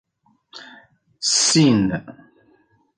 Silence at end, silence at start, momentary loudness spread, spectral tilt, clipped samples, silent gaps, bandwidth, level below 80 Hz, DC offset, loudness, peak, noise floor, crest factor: 0.85 s; 0.55 s; 26 LU; -3.5 dB/octave; under 0.1%; none; 10 kHz; -54 dBFS; under 0.1%; -17 LUFS; -4 dBFS; -59 dBFS; 18 dB